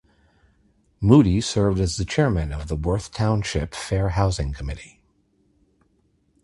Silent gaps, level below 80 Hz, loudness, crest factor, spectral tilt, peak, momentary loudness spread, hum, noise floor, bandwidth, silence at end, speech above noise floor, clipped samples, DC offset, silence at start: none; -34 dBFS; -22 LUFS; 22 dB; -6.5 dB/octave; -2 dBFS; 12 LU; none; -65 dBFS; 11.5 kHz; 1.55 s; 44 dB; under 0.1%; under 0.1%; 1 s